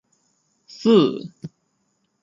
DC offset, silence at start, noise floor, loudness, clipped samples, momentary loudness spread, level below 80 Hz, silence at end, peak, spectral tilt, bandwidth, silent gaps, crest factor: under 0.1%; 0.8 s; -70 dBFS; -18 LUFS; under 0.1%; 24 LU; -70 dBFS; 0.75 s; -4 dBFS; -7 dB/octave; 7.6 kHz; none; 20 dB